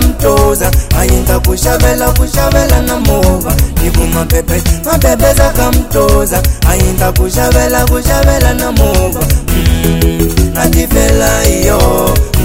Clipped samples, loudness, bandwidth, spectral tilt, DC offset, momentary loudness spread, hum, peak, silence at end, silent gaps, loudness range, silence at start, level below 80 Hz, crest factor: 0.9%; -10 LUFS; 16.5 kHz; -5 dB/octave; 1%; 3 LU; none; 0 dBFS; 0 s; none; 1 LU; 0 s; -12 dBFS; 8 dB